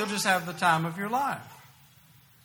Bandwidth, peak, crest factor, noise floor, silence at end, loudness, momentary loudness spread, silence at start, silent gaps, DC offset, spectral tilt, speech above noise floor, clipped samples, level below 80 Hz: over 20 kHz; -10 dBFS; 20 dB; -57 dBFS; 0.85 s; -27 LUFS; 7 LU; 0 s; none; under 0.1%; -3.5 dB/octave; 30 dB; under 0.1%; -70 dBFS